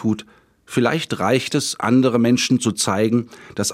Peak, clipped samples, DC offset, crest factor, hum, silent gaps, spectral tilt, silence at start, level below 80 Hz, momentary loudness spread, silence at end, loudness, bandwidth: -4 dBFS; under 0.1%; under 0.1%; 16 dB; none; none; -4.5 dB/octave; 0 s; -60 dBFS; 8 LU; 0 s; -19 LUFS; 16 kHz